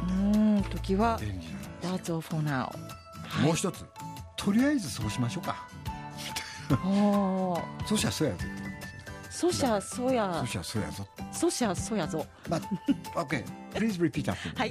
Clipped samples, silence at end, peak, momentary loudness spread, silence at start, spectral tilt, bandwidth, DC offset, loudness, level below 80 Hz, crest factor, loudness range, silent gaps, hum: under 0.1%; 0 s; -12 dBFS; 14 LU; 0 s; -5.5 dB/octave; 15.5 kHz; under 0.1%; -30 LUFS; -48 dBFS; 18 dB; 2 LU; none; none